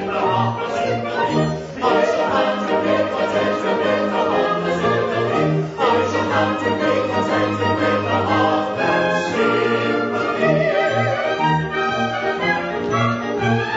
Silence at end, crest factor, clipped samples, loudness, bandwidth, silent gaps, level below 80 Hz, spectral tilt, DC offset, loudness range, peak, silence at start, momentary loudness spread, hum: 0 s; 16 dB; under 0.1%; -19 LUFS; 8 kHz; none; -52 dBFS; -6 dB/octave; under 0.1%; 1 LU; -4 dBFS; 0 s; 4 LU; none